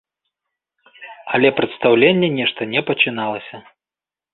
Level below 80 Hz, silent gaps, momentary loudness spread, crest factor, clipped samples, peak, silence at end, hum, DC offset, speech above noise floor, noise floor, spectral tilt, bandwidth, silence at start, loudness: -62 dBFS; none; 14 LU; 18 dB; under 0.1%; -2 dBFS; 0.75 s; none; under 0.1%; over 73 dB; under -90 dBFS; -10 dB/octave; 4.3 kHz; 1 s; -17 LUFS